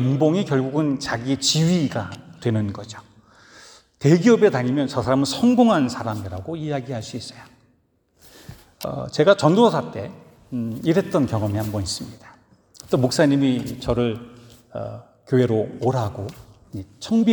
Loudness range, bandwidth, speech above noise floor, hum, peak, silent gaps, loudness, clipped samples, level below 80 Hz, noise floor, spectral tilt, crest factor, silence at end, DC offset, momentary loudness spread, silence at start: 6 LU; over 20 kHz; 43 dB; none; -2 dBFS; none; -21 LUFS; under 0.1%; -52 dBFS; -63 dBFS; -6 dB/octave; 20 dB; 0 s; under 0.1%; 18 LU; 0 s